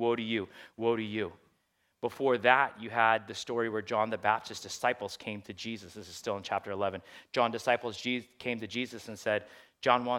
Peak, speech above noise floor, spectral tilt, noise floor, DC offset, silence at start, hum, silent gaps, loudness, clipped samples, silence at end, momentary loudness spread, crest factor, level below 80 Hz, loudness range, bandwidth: -6 dBFS; 43 dB; -4 dB/octave; -75 dBFS; under 0.1%; 0 s; none; none; -32 LUFS; under 0.1%; 0 s; 13 LU; 26 dB; -76 dBFS; 5 LU; 16.5 kHz